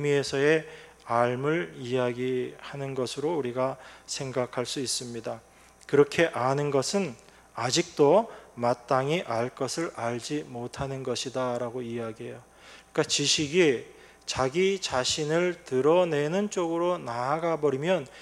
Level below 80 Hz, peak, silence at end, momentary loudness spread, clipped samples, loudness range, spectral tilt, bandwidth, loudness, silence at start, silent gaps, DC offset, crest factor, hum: -62 dBFS; -8 dBFS; 0 s; 13 LU; under 0.1%; 6 LU; -4 dB/octave; 13.5 kHz; -27 LUFS; 0 s; none; under 0.1%; 20 dB; none